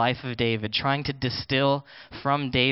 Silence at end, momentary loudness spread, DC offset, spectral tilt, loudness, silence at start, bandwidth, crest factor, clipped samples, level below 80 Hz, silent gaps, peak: 0 s; 7 LU; under 0.1%; -10 dB/octave; -26 LUFS; 0 s; 5.8 kHz; 18 dB; under 0.1%; -52 dBFS; none; -8 dBFS